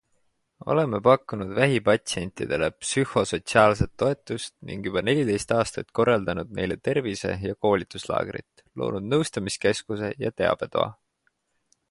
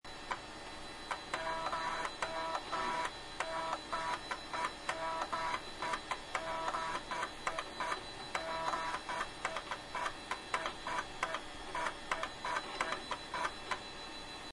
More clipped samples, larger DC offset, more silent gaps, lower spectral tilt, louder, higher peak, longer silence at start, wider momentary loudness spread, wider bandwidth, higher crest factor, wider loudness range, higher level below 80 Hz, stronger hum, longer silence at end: neither; neither; neither; first, -5 dB/octave vs -2 dB/octave; first, -25 LUFS vs -39 LUFS; first, -2 dBFS vs -18 dBFS; first, 0.65 s vs 0.05 s; first, 10 LU vs 5 LU; about the same, 11.5 kHz vs 11.5 kHz; about the same, 22 dB vs 24 dB; first, 4 LU vs 1 LU; first, -50 dBFS vs -58 dBFS; neither; first, 0.95 s vs 0 s